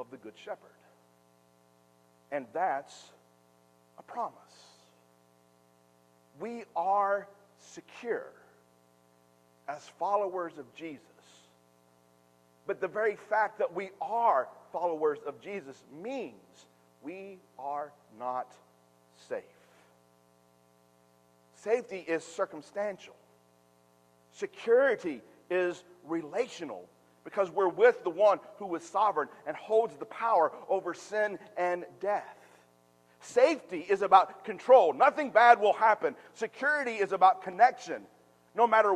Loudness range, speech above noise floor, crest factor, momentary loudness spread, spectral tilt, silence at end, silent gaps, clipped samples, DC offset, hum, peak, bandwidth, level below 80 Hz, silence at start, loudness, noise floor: 17 LU; 36 dB; 26 dB; 20 LU; -4.5 dB/octave; 0 s; none; under 0.1%; under 0.1%; 60 Hz at -70 dBFS; -6 dBFS; 11.5 kHz; -86 dBFS; 0 s; -29 LUFS; -65 dBFS